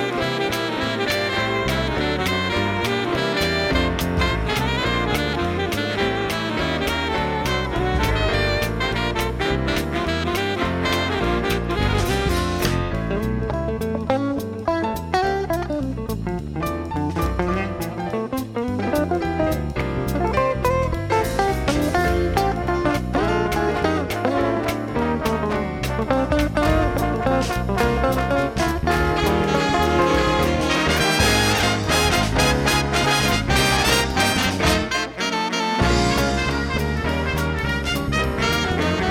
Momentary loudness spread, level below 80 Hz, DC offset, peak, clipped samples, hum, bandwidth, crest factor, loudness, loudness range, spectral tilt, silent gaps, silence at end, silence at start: 6 LU; -30 dBFS; under 0.1%; -4 dBFS; under 0.1%; none; 18 kHz; 18 dB; -21 LUFS; 6 LU; -4.5 dB/octave; none; 0 s; 0 s